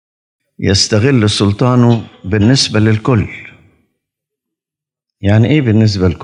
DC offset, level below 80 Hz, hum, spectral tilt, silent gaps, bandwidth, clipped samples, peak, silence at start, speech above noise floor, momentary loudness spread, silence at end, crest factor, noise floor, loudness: under 0.1%; -46 dBFS; none; -5.5 dB/octave; none; 10.5 kHz; under 0.1%; 0 dBFS; 0.6 s; 75 dB; 8 LU; 0 s; 12 dB; -86 dBFS; -12 LUFS